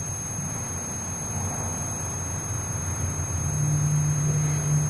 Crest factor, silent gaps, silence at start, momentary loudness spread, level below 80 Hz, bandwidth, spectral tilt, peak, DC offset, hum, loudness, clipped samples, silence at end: 14 dB; none; 0 s; 6 LU; -44 dBFS; 11 kHz; -5 dB/octave; -14 dBFS; under 0.1%; none; -27 LUFS; under 0.1%; 0 s